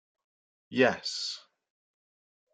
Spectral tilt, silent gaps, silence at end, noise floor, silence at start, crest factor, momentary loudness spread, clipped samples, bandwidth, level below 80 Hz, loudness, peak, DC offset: -3.5 dB/octave; none; 1.15 s; under -90 dBFS; 0.7 s; 24 dB; 11 LU; under 0.1%; 9.4 kHz; -76 dBFS; -29 LUFS; -10 dBFS; under 0.1%